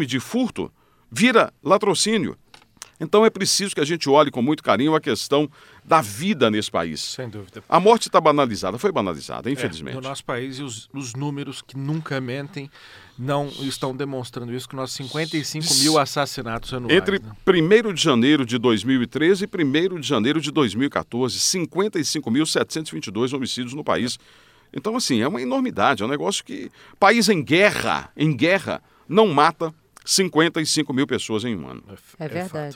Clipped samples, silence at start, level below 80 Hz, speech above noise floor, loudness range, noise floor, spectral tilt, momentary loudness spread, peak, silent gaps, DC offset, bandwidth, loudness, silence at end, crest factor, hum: under 0.1%; 0 s; -56 dBFS; 24 dB; 9 LU; -45 dBFS; -4 dB/octave; 14 LU; -2 dBFS; none; under 0.1%; 16.5 kHz; -21 LUFS; 0 s; 20 dB; none